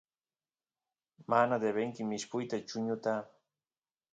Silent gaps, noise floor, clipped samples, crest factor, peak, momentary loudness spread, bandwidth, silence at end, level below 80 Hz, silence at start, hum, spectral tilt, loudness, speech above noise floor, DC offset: none; under -90 dBFS; under 0.1%; 22 dB; -14 dBFS; 9 LU; 9 kHz; 0.9 s; -82 dBFS; 1.2 s; none; -5 dB/octave; -34 LUFS; over 57 dB; under 0.1%